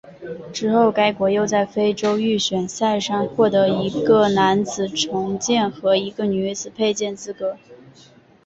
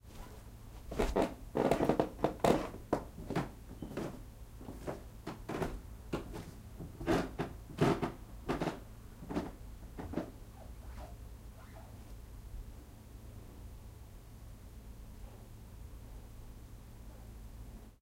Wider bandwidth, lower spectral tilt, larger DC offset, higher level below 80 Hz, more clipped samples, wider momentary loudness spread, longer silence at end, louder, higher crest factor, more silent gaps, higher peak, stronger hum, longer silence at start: second, 8 kHz vs 16 kHz; second, -4.5 dB/octave vs -6.5 dB/octave; neither; second, -58 dBFS vs -50 dBFS; neither; second, 11 LU vs 20 LU; first, 0.7 s vs 0.05 s; first, -20 LUFS vs -38 LUFS; second, 16 dB vs 26 dB; neither; first, -4 dBFS vs -14 dBFS; neither; about the same, 0.05 s vs 0.05 s